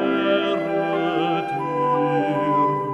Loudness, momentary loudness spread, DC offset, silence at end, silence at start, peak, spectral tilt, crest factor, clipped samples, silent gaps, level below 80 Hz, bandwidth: -21 LUFS; 3 LU; under 0.1%; 0 s; 0 s; -8 dBFS; -7.5 dB/octave; 12 dB; under 0.1%; none; -64 dBFS; 8.4 kHz